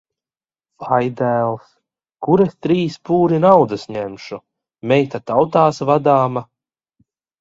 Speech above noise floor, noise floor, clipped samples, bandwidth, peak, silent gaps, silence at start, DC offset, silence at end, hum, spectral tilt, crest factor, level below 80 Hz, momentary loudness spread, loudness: over 74 dB; under -90 dBFS; under 0.1%; 7.8 kHz; 0 dBFS; none; 0.8 s; under 0.1%; 1 s; none; -7.5 dB/octave; 18 dB; -58 dBFS; 16 LU; -17 LUFS